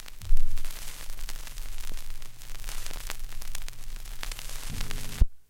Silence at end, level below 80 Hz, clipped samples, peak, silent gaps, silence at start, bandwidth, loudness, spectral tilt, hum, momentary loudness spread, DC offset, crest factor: 0.1 s; -30 dBFS; under 0.1%; -6 dBFS; none; 0 s; 16 kHz; -38 LUFS; -3 dB/octave; none; 10 LU; under 0.1%; 18 dB